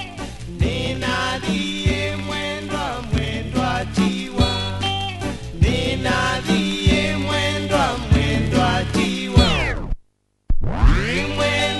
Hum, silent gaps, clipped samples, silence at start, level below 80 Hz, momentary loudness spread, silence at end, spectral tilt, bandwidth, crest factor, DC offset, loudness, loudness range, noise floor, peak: none; none; under 0.1%; 0 s; -26 dBFS; 8 LU; 0 s; -5 dB/octave; 11.5 kHz; 18 dB; under 0.1%; -20 LUFS; 4 LU; -58 dBFS; -2 dBFS